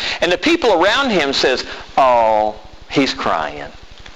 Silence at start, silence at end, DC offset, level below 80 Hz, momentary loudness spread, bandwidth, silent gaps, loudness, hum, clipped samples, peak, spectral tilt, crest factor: 0 s; 0.05 s; 1%; -42 dBFS; 9 LU; 13 kHz; none; -15 LUFS; none; under 0.1%; -4 dBFS; -3.5 dB/octave; 14 dB